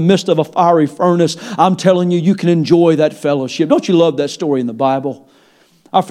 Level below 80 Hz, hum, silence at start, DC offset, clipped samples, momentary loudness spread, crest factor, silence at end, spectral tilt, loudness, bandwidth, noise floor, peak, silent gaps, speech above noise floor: -62 dBFS; none; 0 s; under 0.1%; under 0.1%; 6 LU; 14 dB; 0 s; -6.5 dB/octave; -14 LUFS; 12 kHz; -51 dBFS; 0 dBFS; none; 38 dB